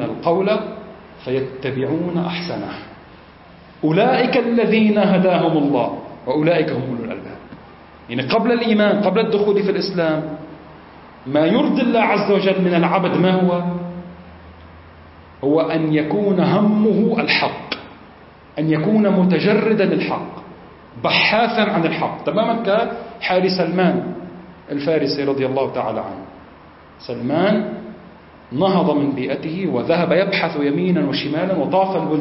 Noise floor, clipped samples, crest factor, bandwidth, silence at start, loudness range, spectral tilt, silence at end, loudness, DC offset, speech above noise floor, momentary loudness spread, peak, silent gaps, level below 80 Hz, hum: -43 dBFS; under 0.1%; 16 dB; 5.8 kHz; 0 s; 5 LU; -10 dB/octave; 0 s; -18 LUFS; under 0.1%; 26 dB; 15 LU; -4 dBFS; none; -54 dBFS; none